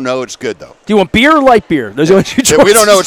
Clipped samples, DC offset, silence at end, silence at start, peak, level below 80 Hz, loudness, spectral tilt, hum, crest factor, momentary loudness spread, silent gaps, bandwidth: 2%; under 0.1%; 0 s; 0 s; 0 dBFS; -36 dBFS; -9 LUFS; -3.5 dB/octave; none; 10 dB; 15 LU; none; over 20 kHz